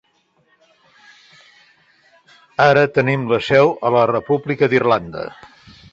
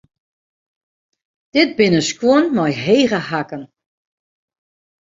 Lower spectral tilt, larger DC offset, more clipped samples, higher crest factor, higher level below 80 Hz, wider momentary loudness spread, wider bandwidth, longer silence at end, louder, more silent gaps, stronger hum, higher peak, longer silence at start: first, -7 dB/octave vs -5 dB/octave; neither; neither; about the same, 18 dB vs 18 dB; about the same, -54 dBFS vs -58 dBFS; first, 15 LU vs 10 LU; about the same, 7.8 kHz vs 7.8 kHz; second, 0.6 s vs 1.4 s; about the same, -16 LUFS vs -16 LUFS; neither; neither; about the same, -2 dBFS vs -2 dBFS; first, 2.6 s vs 1.55 s